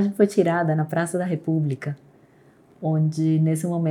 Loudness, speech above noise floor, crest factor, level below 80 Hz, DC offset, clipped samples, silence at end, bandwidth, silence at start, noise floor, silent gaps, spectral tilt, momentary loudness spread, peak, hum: -23 LUFS; 33 dB; 18 dB; -74 dBFS; under 0.1%; under 0.1%; 0 s; 17 kHz; 0 s; -54 dBFS; none; -8 dB/octave; 11 LU; -6 dBFS; none